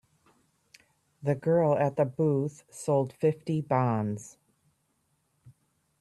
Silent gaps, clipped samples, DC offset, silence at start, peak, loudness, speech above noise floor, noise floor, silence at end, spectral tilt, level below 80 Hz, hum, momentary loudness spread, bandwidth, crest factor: none; under 0.1%; under 0.1%; 1.2 s; -12 dBFS; -28 LUFS; 47 dB; -74 dBFS; 0.5 s; -8 dB/octave; -70 dBFS; none; 11 LU; 12.5 kHz; 18 dB